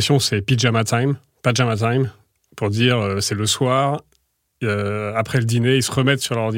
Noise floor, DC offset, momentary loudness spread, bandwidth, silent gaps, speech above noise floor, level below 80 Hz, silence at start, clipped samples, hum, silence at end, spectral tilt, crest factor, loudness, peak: -65 dBFS; under 0.1%; 6 LU; 16.5 kHz; none; 46 dB; -56 dBFS; 0 s; under 0.1%; none; 0 s; -5 dB/octave; 16 dB; -19 LUFS; -2 dBFS